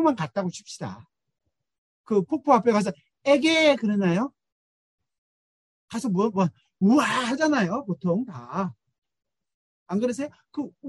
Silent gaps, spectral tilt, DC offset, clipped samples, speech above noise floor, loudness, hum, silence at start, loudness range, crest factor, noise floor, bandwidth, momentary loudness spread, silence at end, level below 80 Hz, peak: 1.78-2.04 s, 4.52-4.98 s, 5.18-5.88 s, 8.98-9.02 s, 9.54-9.86 s; -5.5 dB/octave; under 0.1%; under 0.1%; over 67 dB; -24 LUFS; none; 0 s; 5 LU; 20 dB; under -90 dBFS; 12 kHz; 14 LU; 0 s; -70 dBFS; -6 dBFS